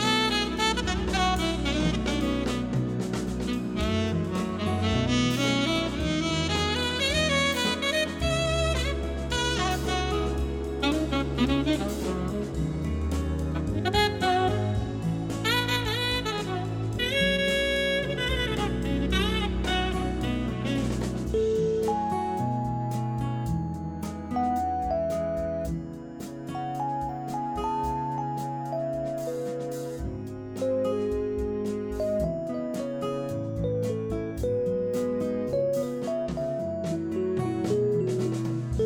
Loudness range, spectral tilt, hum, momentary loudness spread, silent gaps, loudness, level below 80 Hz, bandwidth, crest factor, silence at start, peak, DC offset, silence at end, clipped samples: 5 LU; -5 dB/octave; none; 7 LU; none; -28 LUFS; -38 dBFS; 19 kHz; 16 dB; 0 s; -12 dBFS; under 0.1%; 0 s; under 0.1%